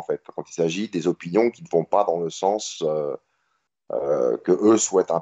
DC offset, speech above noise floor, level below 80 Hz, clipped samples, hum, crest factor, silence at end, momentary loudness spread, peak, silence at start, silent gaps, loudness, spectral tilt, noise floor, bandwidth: under 0.1%; 51 dB; -70 dBFS; under 0.1%; none; 18 dB; 0 s; 12 LU; -6 dBFS; 0 s; none; -23 LUFS; -4.5 dB/octave; -73 dBFS; 8.2 kHz